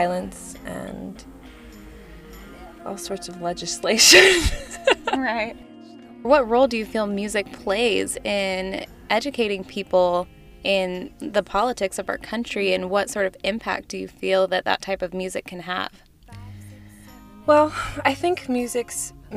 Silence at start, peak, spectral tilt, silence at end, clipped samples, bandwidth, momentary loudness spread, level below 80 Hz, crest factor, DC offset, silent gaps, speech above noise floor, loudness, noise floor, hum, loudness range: 0 s; -2 dBFS; -2.5 dB/octave; 0 s; under 0.1%; 15.5 kHz; 16 LU; -42 dBFS; 22 dB; under 0.1%; none; 23 dB; -21 LUFS; -45 dBFS; none; 9 LU